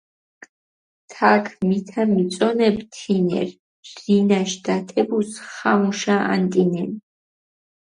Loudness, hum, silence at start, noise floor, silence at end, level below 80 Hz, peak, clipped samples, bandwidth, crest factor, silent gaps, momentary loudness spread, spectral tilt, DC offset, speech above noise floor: -20 LUFS; none; 1.1 s; under -90 dBFS; 0.85 s; -64 dBFS; 0 dBFS; under 0.1%; 10.5 kHz; 20 dB; 3.59-3.83 s; 11 LU; -6 dB/octave; under 0.1%; over 70 dB